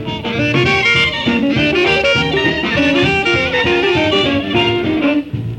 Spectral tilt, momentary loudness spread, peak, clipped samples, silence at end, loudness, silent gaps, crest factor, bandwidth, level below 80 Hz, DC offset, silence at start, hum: -5.5 dB/octave; 4 LU; -2 dBFS; under 0.1%; 0 s; -13 LUFS; none; 12 dB; 10.5 kHz; -38 dBFS; under 0.1%; 0 s; none